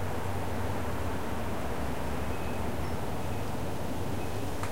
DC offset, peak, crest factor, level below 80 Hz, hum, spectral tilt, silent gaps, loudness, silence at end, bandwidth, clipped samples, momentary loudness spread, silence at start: 2%; -20 dBFS; 14 dB; -44 dBFS; none; -6 dB/octave; none; -35 LUFS; 0 s; 16 kHz; under 0.1%; 1 LU; 0 s